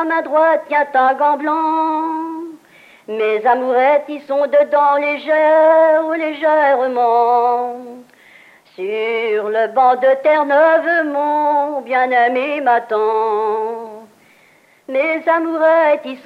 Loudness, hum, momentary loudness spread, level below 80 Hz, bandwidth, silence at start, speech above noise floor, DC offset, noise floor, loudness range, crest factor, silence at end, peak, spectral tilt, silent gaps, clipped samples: -15 LUFS; none; 10 LU; -82 dBFS; 5.8 kHz; 0 s; 37 dB; under 0.1%; -51 dBFS; 4 LU; 12 dB; 0.05 s; -2 dBFS; -5 dB/octave; none; under 0.1%